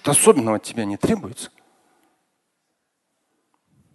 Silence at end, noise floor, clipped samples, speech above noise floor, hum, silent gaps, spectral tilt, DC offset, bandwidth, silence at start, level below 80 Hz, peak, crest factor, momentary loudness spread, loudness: 2.5 s; -74 dBFS; under 0.1%; 55 dB; none; none; -4 dB/octave; under 0.1%; 12.5 kHz; 0.05 s; -54 dBFS; 0 dBFS; 22 dB; 21 LU; -19 LUFS